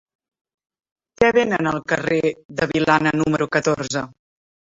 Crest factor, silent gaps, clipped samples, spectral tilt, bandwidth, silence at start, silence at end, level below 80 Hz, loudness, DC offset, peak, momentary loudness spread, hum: 20 dB; 2.45-2.49 s; under 0.1%; -5 dB/octave; 8 kHz; 1.2 s; 0.7 s; -52 dBFS; -20 LUFS; under 0.1%; -2 dBFS; 8 LU; none